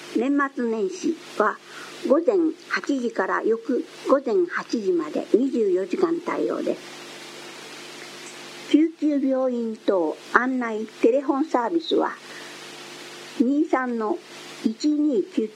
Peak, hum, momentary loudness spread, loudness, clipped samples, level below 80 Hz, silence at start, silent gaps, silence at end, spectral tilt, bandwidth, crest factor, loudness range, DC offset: 0 dBFS; none; 17 LU; -23 LUFS; under 0.1%; -78 dBFS; 0 s; none; 0 s; -4.5 dB/octave; 13 kHz; 24 dB; 3 LU; under 0.1%